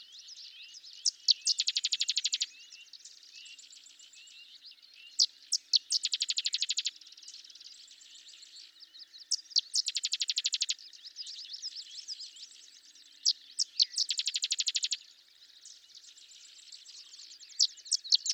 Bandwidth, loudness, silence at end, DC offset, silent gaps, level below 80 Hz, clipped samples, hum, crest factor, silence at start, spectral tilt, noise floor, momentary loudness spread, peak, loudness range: 17.5 kHz; -30 LUFS; 0 s; under 0.1%; none; under -90 dBFS; under 0.1%; none; 24 dB; 0 s; 7.5 dB/octave; -59 dBFS; 23 LU; -12 dBFS; 5 LU